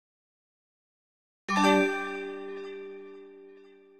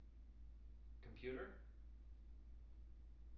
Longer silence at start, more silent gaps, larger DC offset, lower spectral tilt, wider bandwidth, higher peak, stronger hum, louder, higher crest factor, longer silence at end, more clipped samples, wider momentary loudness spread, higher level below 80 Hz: first, 1.5 s vs 0 s; neither; neither; second, -4.5 dB/octave vs -6 dB/octave; first, 15 kHz vs 5.8 kHz; first, -10 dBFS vs -38 dBFS; neither; first, -28 LUFS vs -58 LUFS; about the same, 22 dB vs 18 dB; first, 0.3 s vs 0 s; neither; first, 23 LU vs 12 LU; second, -76 dBFS vs -60 dBFS